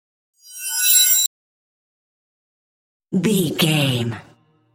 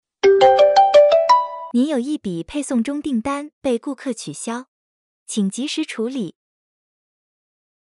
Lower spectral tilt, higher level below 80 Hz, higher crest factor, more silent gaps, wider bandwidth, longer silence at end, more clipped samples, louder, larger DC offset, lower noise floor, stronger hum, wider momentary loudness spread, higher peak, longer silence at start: second, -3 dB/octave vs -4.5 dB/octave; about the same, -62 dBFS vs -58 dBFS; about the same, 20 dB vs 16 dB; first, 1.27-3.00 s vs 3.53-3.61 s, 4.68-5.26 s; first, 17 kHz vs 11.5 kHz; second, 0.55 s vs 1.5 s; neither; about the same, -16 LUFS vs -18 LUFS; neither; about the same, under -90 dBFS vs under -90 dBFS; neither; about the same, 16 LU vs 16 LU; about the same, -2 dBFS vs -4 dBFS; first, 0.5 s vs 0.25 s